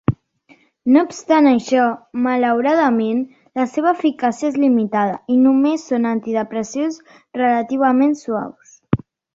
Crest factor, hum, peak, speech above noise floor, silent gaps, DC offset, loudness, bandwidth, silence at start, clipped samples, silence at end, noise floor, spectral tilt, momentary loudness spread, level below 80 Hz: 16 dB; none; -2 dBFS; 37 dB; none; under 0.1%; -18 LUFS; 7.8 kHz; 0.1 s; under 0.1%; 0.4 s; -53 dBFS; -6.5 dB/octave; 10 LU; -52 dBFS